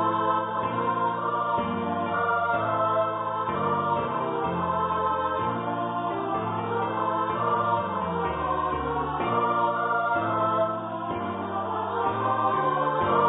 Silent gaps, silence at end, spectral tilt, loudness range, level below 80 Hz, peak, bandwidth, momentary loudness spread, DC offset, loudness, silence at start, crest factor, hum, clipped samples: none; 0 s; -10.5 dB/octave; 1 LU; -52 dBFS; -12 dBFS; 4 kHz; 4 LU; under 0.1%; -26 LUFS; 0 s; 14 dB; none; under 0.1%